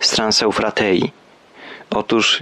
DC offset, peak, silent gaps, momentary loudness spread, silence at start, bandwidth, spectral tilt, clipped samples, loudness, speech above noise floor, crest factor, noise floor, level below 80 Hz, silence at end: under 0.1%; -4 dBFS; none; 14 LU; 0 s; 12.5 kHz; -3 dB/octave; under 0.1%; -17 LUFS; 23 dB; 14 dB; -40 dBFS; -50 dBFS; 0 s